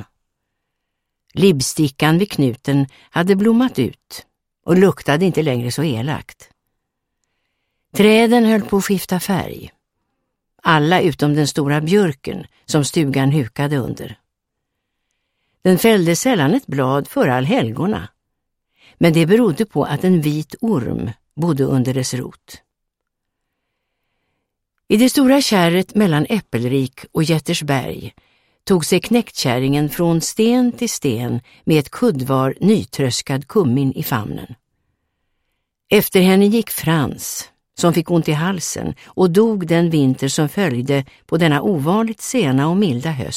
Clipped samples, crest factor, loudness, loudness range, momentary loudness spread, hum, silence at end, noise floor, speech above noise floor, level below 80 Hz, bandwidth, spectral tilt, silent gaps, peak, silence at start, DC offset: under 0.1%; 18 dB; -17 LUFS; 4 LU; 11 LU; none; 0 s; -77 dBFS; 61 dB; -50 dBFS; 16.5 kHz; -5.5 dB/octave; none; 0 dBFS; 0 s; under 0.1%